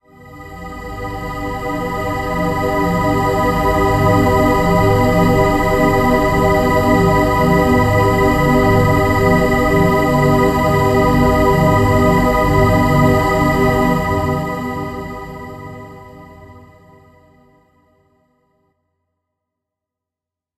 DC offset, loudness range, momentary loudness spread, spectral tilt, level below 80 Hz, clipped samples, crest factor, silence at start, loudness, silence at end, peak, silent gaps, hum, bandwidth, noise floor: under 0.1%; 8 LU; 13 LU; -7 dB/octave; -28 dBFS; under 0.1%; 14 dB; 0.25 s; -14 LUFS; 4 s; -2 dBFS; none; none; 15 kHz; -86 dBFS